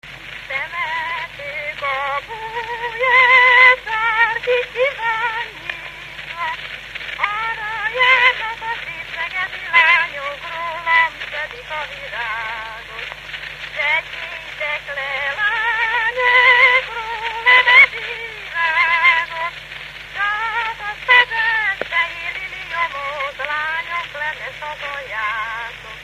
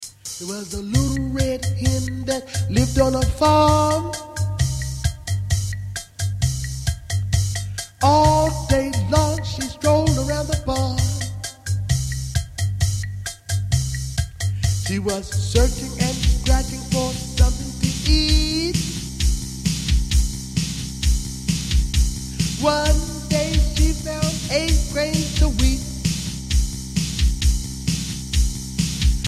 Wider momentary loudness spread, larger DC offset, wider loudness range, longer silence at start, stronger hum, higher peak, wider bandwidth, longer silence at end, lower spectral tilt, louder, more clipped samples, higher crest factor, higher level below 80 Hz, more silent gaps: first, 17 LU vs 8 LU; neither; first, 10 LU vs 4 LU; about the same, 0.05 s vs 0 s; neither; first, 0 dBFS vs -4 dBFS; about the same, 15 kHz vs 15 kHz; about the same, 0 s vs 0 s; second, -1.5 dB/octave vs -5 dB/octave; first, -16 LUFS vs -21 LUFS; neither; about the same, 18 dB vs 16 dB; second, -50 dBFS vs -24 dBFS; neither